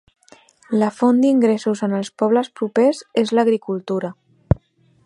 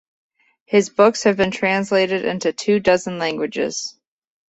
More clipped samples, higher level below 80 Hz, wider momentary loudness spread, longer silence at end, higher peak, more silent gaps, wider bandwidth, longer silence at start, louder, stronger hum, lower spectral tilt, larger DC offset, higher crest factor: neither; first, -40 dBFS vs -56 dBFS; about the same, 8 LU vs 9 LU; about the same, 0.5 s vs 0.6 s; about the same, 0 dBFS vs -2 dBFS; neither; first, 11 kHz vs 8.2 kHz; about the same, 0.7 s vs 0.7 s; about the same, -19 LUFS vs -19 LUFS; neither; first, -7 dB/octave vs -4.5 dB/octave; neither; about the same, 18 dB vs 18 dB